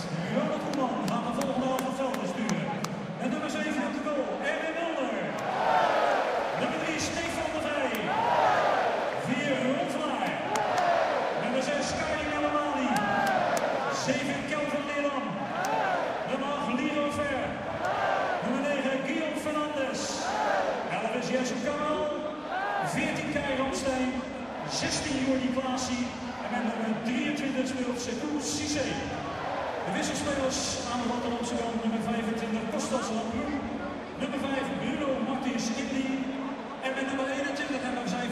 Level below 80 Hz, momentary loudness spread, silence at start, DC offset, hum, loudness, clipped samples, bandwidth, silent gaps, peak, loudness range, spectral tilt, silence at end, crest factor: -58 dBFS; 6 LU; 0 s; under 0.1%; none; -29 LUFS; under 0.1%; 15 kHz; none; -8 dBFS; 3 LU; -4 dB/octave; 0 s; 20 dB